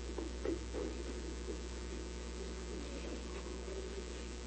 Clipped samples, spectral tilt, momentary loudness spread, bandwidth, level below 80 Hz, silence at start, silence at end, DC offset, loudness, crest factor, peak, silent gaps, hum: under 0.1%; -5 dB/octave; 4 LU; 8.4 kHz; -46 dBFS; 0 s; 0 s; under 0.1%; -44 LUFS; 16 dB; -26 dBFS; none; 60 Hz at -45 dBFS